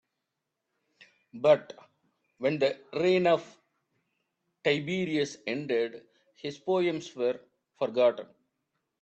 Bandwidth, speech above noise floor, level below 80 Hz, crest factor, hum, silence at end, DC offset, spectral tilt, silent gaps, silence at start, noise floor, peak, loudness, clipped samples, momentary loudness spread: 8.4 kHz; 57 dB; -76 dBFS; 20 dB; none; 0.75 s; under 0.1%; -5.5 dB/octave; none; 1.35 s; -85 dBFS; -10 dBFS; -29 LUFS; under 0.1%; 14 LU